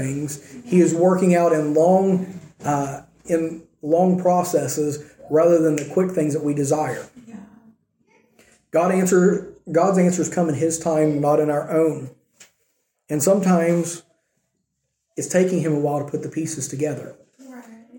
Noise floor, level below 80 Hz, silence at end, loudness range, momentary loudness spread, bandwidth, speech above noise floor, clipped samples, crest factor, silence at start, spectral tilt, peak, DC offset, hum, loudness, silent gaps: -75 dBFS; -62 dBFS; 0 s; 5 LU; 14 LU; 17 kHz; 56 dB; under 0.1%; 16 dB; 0 s; -6.5 dB/octave; -4 dBFS; under 0.1%; none; -20 LUFS; none